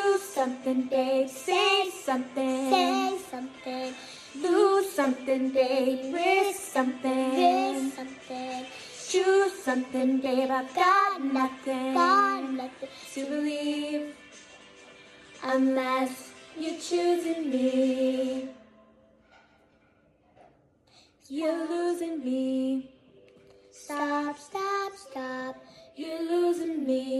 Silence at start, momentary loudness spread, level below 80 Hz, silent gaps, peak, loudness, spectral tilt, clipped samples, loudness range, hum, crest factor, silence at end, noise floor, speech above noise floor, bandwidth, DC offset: 0 s; 15 LU; -74 dBFS; none; -10 dBFS; -27 LUFS; -2.5 dB/octave; under 0.1%; 8 LU; none; 18 dB; 0 s; -64 dBFS; 37 dB; 13 kHz; under 0.1%